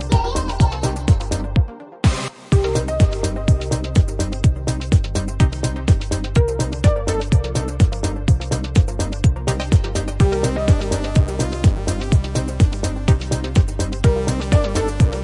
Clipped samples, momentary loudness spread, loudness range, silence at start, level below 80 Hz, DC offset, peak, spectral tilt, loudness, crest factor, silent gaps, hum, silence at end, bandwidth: under 0.1%; 4 LU; 1 LU; 0 s; -24 dBFS; under 0.1%; -2 dBFS; -6 dB/octave; -19 LUFS; 14 dB; none; none; 0 s; 11.5 kHz